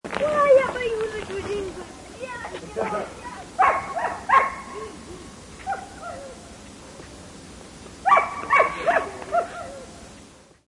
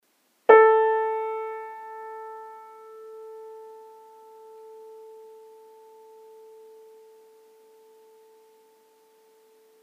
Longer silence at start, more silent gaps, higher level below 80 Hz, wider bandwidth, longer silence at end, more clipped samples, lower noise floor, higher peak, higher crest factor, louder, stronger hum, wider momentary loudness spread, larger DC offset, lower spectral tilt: second, 0.05 s vs 0.5 s; neither; first, -52 dBFS vs under -90 dBFS; first, 11.5 kHz vs 3.8 kHz; second, 0.4 s vs 6.25 s; neither; second, -49 dBFS vs -60 dBFS; about the same, -4 dBFS vs -2 dBFS; about the same, 22 dB vs 26 dB; second, -23 LUFS vs -20 LUFS; neither; second, 23 LU vs 31 LU; neither; about the same, -4 dB/octave vs -3.5 dB/octave